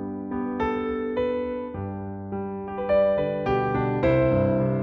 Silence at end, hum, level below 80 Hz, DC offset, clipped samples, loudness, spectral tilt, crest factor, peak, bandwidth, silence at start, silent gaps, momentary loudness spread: 0 s; none; -44 dBFS; under 0.1%; under 0.1%; -25 LUFS; -10 dB/octave; 14 dB; -10 dBFS; 6.2 kHz; 0 s; none; 11 LU